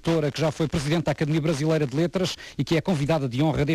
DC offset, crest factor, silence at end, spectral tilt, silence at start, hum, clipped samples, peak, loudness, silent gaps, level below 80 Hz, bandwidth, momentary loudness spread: under 0.1%; 12 dB; 0 s; -6.5 dB/octave; 0.05 s; none; under 0.1%; -12 dBFS; -24 LUFS; none; -46 dBFS; 14 kHz; 3 LU